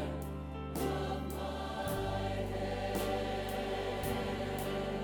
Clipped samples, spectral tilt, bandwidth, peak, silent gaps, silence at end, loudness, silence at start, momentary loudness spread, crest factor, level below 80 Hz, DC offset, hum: under 0.1%; -5.5 dB/octave; over 20 kHz; -22 dBFS; none; 0 s; -37 LUFS; 0 s; 4 LU; 14 dB; -46 dBFS; under 0.1%; none